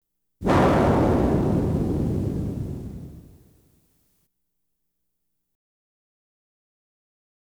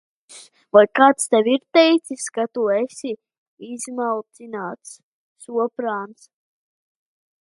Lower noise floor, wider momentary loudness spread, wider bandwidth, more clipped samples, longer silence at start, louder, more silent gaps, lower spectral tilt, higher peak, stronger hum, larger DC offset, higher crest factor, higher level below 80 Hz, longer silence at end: first, -79 dBFS vs -46 dBFS; about the same, 17 LU vs 17 LU; first, over 20 kHz vs 11.5 kHz; neither; about the same, 0.4 s vs 0.3 s; second, -22 LUFS vs -19 LUFS; second, none vs 3.38-3.57 s, 5.03-5.36 s; first, -8 dB/octave vs -3 dB/octave; second, -8 dBFS vs 0 dBFS; neither; neither; about the same, 18 dB vs 22 dB; first, -38 dBFS vs -74 dBFS; first, 4.35 s vs 1.35 s